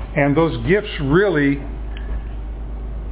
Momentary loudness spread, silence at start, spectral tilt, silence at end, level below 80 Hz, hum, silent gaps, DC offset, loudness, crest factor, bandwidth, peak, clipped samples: 15 LU; 0 s; -11 dB/octave; 0 s; -28 dBFS; none; none; under 0.1%; -19 LUFS; 16 dB; 4 kHz; -4 dBFS; under 0.1%